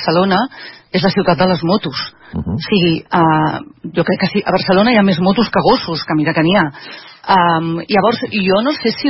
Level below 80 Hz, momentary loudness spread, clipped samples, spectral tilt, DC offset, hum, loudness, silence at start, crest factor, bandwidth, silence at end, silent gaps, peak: -44 dBFS; 11 LU; under 0.1%; -9.5 dB/octave; under 0.1%; none; -14 LUFS; 0 s; 14 dB; 5.8 kHz; 0 s; none; 0 dBFS